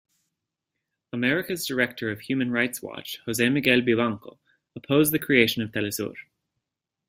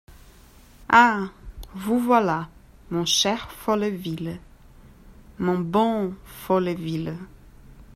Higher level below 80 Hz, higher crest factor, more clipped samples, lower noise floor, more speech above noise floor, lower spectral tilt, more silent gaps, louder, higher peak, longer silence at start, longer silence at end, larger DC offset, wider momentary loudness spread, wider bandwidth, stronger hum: second, -62 dBFS vs -48 dBFS; about the same, 22 dB vs 22 dB; neither; first, -85 dBFS vs -50 dBFS; first, 60 dB vs 28 dB; about the same, -4.5 dB/octave vs -4 dB/octave; neither; about the same, -24 LUFS vs -23 LUFS; about the same, -4 dBFS vs -2 dBFS; first, 1.15 s vs 0.1 s; first, 0.9 s vs 0.1 s; neither; second, 14 LU vs 18 LU; about the same, 16 kHz vs 16 kHz; neither